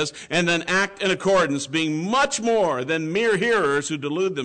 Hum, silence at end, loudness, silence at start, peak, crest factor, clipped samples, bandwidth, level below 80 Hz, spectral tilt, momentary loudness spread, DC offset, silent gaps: none; 0 s; -21 LUFS; 0 s; -12 dBFS; 10 dB; under 0.1%; 9.4 kHz; -58 dBFS; -4 dB/octave; 5 LU; under 0.1%; none